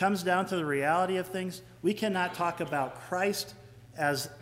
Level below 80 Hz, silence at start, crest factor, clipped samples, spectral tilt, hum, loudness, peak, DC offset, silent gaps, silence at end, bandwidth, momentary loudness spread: -66 dBFS; 0 s; 18 dB; under 0.1%; -4.5 dB/octave; none; -30 LUFS; -14 dBFS; under 0.1%; none; 0 s; 16 kHz; 9 LU